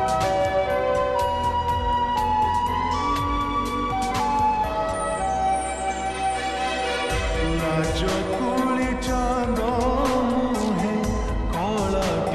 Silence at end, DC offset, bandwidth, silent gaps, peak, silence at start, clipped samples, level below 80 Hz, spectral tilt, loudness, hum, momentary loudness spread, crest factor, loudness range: 0 s; under 0.1%; 13.5 kHz; none; -12 dBFS; 0 s; under 0.1%; -34 dBFS; -5 dB/octave; -23 LUFS; none; 3 LU; 12 dB; 2 LU